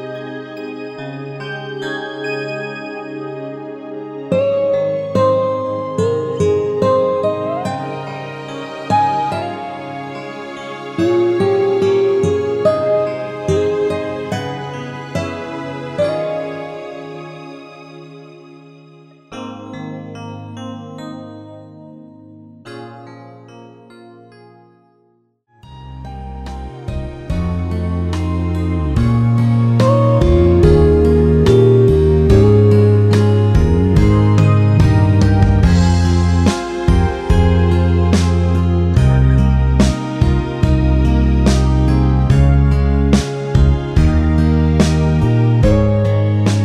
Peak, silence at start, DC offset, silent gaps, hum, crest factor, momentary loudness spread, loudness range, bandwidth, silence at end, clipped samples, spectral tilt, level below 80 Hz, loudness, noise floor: 0 dBFS; 0 s; under 0.1%; none; none; 14 dB; 18 LU; 20 LU; 11 kHz; 0 s; under 0.1%; -8 dB/octave; -22 dBFS; -14 LUFS; -58 dBFS